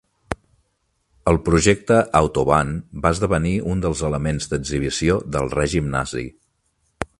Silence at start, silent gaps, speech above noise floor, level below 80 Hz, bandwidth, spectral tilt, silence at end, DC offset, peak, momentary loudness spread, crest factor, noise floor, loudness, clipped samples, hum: 0.3 s; none; 50 dB; -34 dBFS; 11.5 kHz; -5.5 dB/octave; 0.15 s; under 0.1%; 0 dBFS; 14 LU; 20 dB; -69 dBFS; -20 LUFS; under 0.1%; none